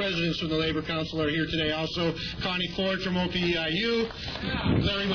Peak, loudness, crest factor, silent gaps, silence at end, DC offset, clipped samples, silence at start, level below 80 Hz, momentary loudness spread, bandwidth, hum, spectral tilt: -12 dBFS; -27 LUFS; 14 dB; none; 0 s; under 0.1%; under 0.1%; 0 s; -44 dBFS; 4 LU; 5.4 kHz; none; -6 dB/octave